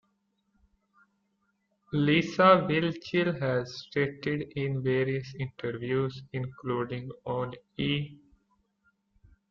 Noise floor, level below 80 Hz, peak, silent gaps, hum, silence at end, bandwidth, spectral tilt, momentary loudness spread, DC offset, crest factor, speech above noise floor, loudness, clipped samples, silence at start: -75 dBFS; -64 dBFS; -8 dBFS; none; none; 1.35 s; 7.2 kHz; -7 dB/octave; 14 LU; under 0.1%; 22 dB; 47 dB; -29 LUFS; under 0.1%; 1.9 s